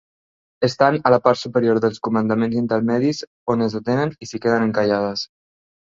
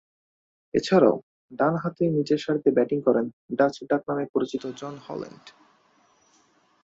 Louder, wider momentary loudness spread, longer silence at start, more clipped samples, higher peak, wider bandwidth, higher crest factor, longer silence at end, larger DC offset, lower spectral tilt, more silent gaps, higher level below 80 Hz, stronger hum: first, -20 LUFS vs -24 LUFS; second, 8 LU vs 15 LU; second, 0.6 s vs 0.75 s; neither; first, -2 dBFS vs -6 dBFS; about the same, 7.6 kHz vs 7.8 kHz; about the same, 18 dB vs 20 dB; second, 0.65 s vs 1.35 s; neither; about the same, -6.5 dB/octave vs -7 dB/octave; second, 3.27-3.46 s vs 1.23-1.49 s, 3.33-3.49 s, 4.29-4.34 s; first, -58 dBFS vs -66 dBFS; neither